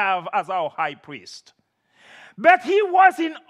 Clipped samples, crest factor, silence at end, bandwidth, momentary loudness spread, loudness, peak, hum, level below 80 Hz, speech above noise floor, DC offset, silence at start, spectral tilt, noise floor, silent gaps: under 0.1%; 20 dB; 0.1 s; 11.5 kHz; 22 LU; -19 LUFS; 0 dBFS; none; -82 dBFS; 38 dB; under 0.1%; 0 s; -4 dB/octave; -58 dBFS; none